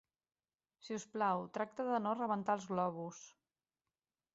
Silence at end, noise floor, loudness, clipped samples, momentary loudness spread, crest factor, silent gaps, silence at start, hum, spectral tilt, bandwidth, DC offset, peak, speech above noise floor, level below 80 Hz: 1.05 s; under -90 dBFS; -39 LUFS; under 0.1%; 11 LU; 20 dB; none; 0.85 s; none; -5.5 dB/octave; 8 kHz; under 0.1%; -22 dBFS; over 52 dB; -84 dBFS